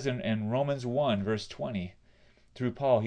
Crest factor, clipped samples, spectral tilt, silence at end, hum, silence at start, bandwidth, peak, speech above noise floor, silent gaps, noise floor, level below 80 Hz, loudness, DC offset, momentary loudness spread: 18 dB; under 0.1%; -7 dB/octave; 0 s; none; 0 s; 10 kHz; -14 dBFS; 31 dB; none; -61 dBFS; -62 dBFS; -31 LUFS; under 0.1%; 7 LU